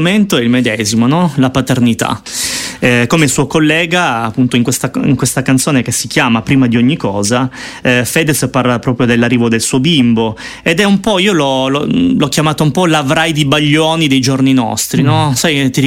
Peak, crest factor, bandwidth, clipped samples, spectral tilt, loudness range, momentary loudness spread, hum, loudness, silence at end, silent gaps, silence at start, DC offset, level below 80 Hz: 0 dBFS; 12 dB; 16.5 kHz; under 0.1%; -4.5 dB/octave; 1 LU; 4 LU; none; -11 LUFS; 0 s; none; 0 s; under 0.1%; -42 dBFS